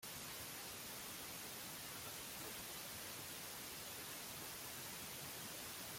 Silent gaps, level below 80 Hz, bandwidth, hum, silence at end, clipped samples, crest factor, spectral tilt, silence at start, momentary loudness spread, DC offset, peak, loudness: none; -74 dBFS; 16.5 kHz; none; 0 s; under 0.1%; 16 dB; -1.5 dB/octave; 0 s; 1 LU; under 0.1%; -34 dBFS; -48 LUFS